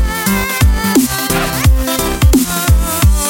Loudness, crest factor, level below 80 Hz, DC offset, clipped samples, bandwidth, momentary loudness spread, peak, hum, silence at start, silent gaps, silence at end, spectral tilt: -13 LUFS; 12 dB; -16 dBFS; under 0.1%; under 0.1%; 17 kHz; 3 LU; 0 dBFS; none; 0 s; none; 0 s; -4.5 dB/octave